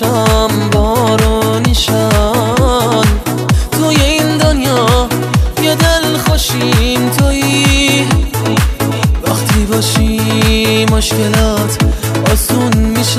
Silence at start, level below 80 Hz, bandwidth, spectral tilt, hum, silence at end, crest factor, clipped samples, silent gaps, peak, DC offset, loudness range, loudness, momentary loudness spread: 0 s; -18 dBFS; 15.5 kHz; -4.5 dB/octave; none; 0 s; 10 dB; under 0.1%; none; 0 dBFS; under 0.1%; 1 LU; -11 LUFS; 3 LU